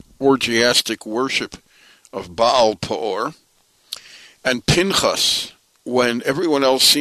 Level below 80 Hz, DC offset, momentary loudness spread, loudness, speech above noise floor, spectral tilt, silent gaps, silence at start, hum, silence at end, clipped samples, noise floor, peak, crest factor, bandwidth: -48 dBFS; under 0.1%; 18 LU; -18 LUFS; 30 dB; -3 dB/octave; none; 0.2 s; none; 0 s; under 0.1%; -48 dBFS; -2 dBFS; 18 dB; 13.5 kHz